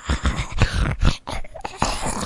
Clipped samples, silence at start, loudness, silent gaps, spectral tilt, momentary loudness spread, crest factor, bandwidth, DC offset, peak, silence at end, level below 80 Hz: under 0.1%; 0 s; -24 LUFS; none; -4.5 dB/octave; 10 LU; 22 dB; 11.5 kHz; under 0.1%; 0 dBFS; 0 s; -26 dBFS